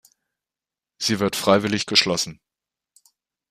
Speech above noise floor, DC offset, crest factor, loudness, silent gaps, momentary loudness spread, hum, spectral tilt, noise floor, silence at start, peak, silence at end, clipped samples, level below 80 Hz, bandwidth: 69 dB; under 0.1%; 24 dB; -20 LUFS; none; 8 LU; none; -3.5 dB/octave; -90 dBFS; 1 s; -2 dBFS; 1.2 s; under 0.1%; -62 dBFS; 15.5 kHz